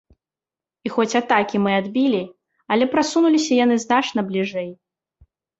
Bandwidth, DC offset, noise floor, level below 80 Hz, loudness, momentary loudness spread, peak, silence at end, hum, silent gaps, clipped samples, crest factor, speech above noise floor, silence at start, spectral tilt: 8 kHz; under 0.1%; under -90 dBFS; -64 dBFS; -20 LUFS; 9 LU; -4 dBFS; 0.85 s; none; none; under 0.1%; 18 dB; over 71 dB; 0.85 s; -4.5 dB/octave